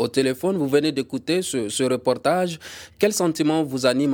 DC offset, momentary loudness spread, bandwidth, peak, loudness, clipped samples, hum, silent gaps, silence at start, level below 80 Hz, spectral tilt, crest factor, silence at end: under 0.1%; 5 LU; 20 kHz; -6 dBFS; -22 LUFS; under 0.1%; none; none; 0 s; -62 dBFS; -4.5 dB/octave; 16 dB; 0 s